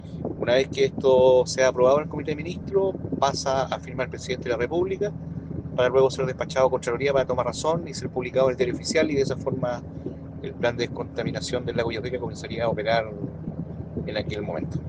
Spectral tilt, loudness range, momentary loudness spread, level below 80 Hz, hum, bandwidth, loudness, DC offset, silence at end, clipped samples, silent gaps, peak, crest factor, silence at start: -5.5 dB/octave; 6 LU; 13 LU; -48 dBFS; none; 9.6 kHz; -25 LUFS; under 0.1%; 0 s; under 0.1%; none; -6 dBFS; 18 dB; 0 s